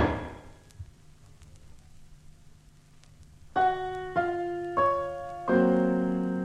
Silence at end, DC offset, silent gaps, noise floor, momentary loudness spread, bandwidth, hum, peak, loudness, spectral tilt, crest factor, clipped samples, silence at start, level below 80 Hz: 0 s; under 0.1%; none; -55 dBFS; 25 LU; 11 kHz; none; -12 dBFS; -28 LUFS; -8 dB/octave; 18 dB; under 0.1%; 0 s; -50 dBFS